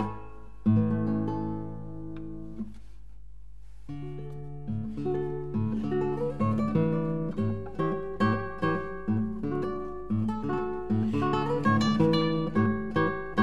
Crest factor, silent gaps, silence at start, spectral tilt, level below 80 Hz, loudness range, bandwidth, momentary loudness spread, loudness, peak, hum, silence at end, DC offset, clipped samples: 18 dB; none; 0 s; -8 dB/octave; -48 dBFS; 11 LU; 8 kHz; 15 LU; -29 LUFS; -10 dBFS; none; 0 s; 0.9%; under 0.1%